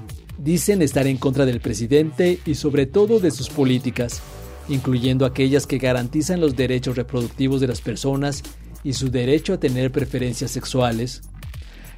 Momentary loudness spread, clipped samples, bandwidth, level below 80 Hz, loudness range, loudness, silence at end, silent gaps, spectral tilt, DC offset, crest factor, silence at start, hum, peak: 13 LU; under 0.1%; 16 kHz; -38 dBFS; 4 LU; -21 LUFS; 0 s; none; -6 dB/octave; under 0.1%; 16 dB; 0 s; none; -4 dBFS